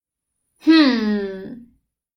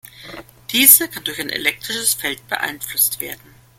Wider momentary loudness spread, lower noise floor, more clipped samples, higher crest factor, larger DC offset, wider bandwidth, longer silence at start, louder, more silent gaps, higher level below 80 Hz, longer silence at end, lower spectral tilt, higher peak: second, 20 LU vs 26 LU; first, -78 dBFS vs -38 dBFS; second, under 0.1% vs 0.1%; about the same, 18 dB vs 20 dB; neither; second, 6.2 kHz vs 17 kHz; first, 0.65 s vs 0.2 s; about the same, -17 LUFS vs -15 LUFS; neither; about the same, -58 dBFS vs -56 dBFS; first, 0.6 s vs 0.45 s; first, -6 dB/octave vs 0 dB/octave; about the same, -2 dBFS vs 0 dBFS